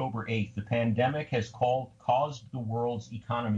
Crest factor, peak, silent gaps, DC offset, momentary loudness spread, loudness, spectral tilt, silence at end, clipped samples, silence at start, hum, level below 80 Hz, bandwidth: 16 dB; -14 dBFS; none; under 0.1%; 7 LU; -31 LUFS; -7 dB/octave; 0 s; under 0.1%; 0 s; none; -62 dBFS; 7.6 kHz